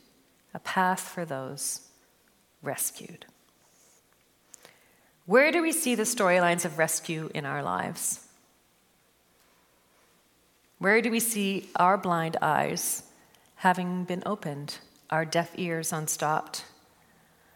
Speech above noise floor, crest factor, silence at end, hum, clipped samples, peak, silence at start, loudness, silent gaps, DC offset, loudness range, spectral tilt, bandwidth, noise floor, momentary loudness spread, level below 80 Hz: 38 dB; 22 dB; 0.85 s; none; under 0.1%; -8 dBFS; 0.55 s; -27 LUFS; none; under 0.1%; 10 LU; -3.5 dB/octave; 17.5 kHz; -66 dBFS; 14 LU; -78 dBFS